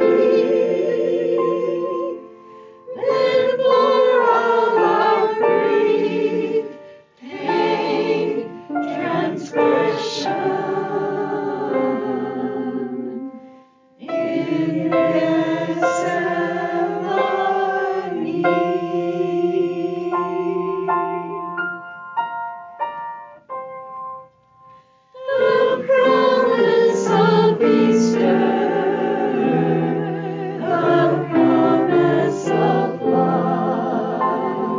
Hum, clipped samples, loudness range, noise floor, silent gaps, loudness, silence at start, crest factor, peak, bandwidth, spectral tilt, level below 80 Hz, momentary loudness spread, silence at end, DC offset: none; under 0.1%; 8 LU; -49 dBFS; none; -19 LUFS; 0 s; 16 dB; -4 dBFS; 7.6 kHz; -6.5 dB/octave; -66 dBFS; 12 LU; 0 s; under 0.1%